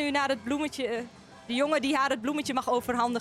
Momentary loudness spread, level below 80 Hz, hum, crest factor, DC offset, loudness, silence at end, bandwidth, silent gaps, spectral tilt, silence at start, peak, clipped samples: 8 LU; -62 dBFS; none; 14 dB; under 0.1%; -29 LUFS; 0 s; 15.5 kHz; none; -3.5 dB/octave; 0 s; -14 dBFS; under 0.1%